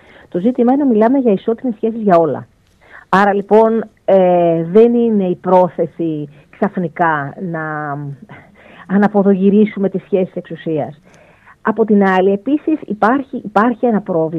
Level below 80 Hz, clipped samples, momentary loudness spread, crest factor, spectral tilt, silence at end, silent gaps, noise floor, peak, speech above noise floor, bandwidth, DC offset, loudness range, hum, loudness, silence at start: -58 dBFS; under 0.1%; 11 LU; 14 dB; -9 dB/octave; 0 s; none; -43 dBFS; 0 dBFS; 29 dB; 6.2 kHz; under 0.1%; 5 LU; none; -14 LUFS; 0.35 s